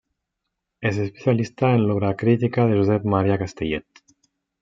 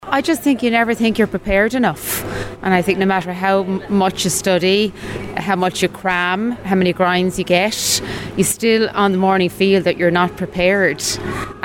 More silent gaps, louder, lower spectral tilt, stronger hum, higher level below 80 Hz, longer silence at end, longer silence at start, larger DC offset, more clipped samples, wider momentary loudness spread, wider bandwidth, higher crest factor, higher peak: neither; second, -21 LUFS vs -17 LUFS; first, -8 dB/octave vs -4 dB/octave; neither; second, -54 dBFS vs -42 dBFS; first, 0.8 s vs 0 s; first, 0.8 s vs 0 s; neither; neither; about the same, 8 LU vs 7 LU; second, 7.4 kHz vs 16.5 kHz; about the same, 18 dB vs 16 dB; about the same, -4 dBFS vs -2 dBFS